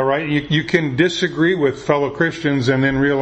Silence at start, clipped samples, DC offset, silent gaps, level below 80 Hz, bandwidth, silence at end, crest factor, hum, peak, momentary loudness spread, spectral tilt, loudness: 0 s; under 0.1%; under 0.1%; none; -46 dBFS; 8.6 kHz; 0 s; 16 dB; none; 0 dBFS; 3 LU; -6 dB/octave; -17 LUFS